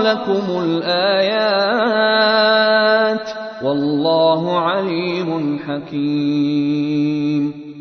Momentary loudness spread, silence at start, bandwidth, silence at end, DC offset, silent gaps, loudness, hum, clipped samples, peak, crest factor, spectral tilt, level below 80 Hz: 9 LU; 0 s; 6.4 kHz; 0 s; under 0.1%; none; -17 LUFS; none; under 0.1%; -2 dBFS; 14 dB; -6.5 dB/octave; -62 dBFS